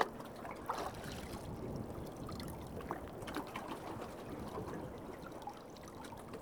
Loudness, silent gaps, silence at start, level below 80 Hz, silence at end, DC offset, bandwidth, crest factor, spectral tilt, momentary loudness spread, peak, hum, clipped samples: -46 LUFS; none; 0 s; -60 dBFS; 0 s; under 0.1%; over 20 kHz; 30 dB; -5.5 dB/octave; 7 LU; -14 dBFS; none; under 0.1%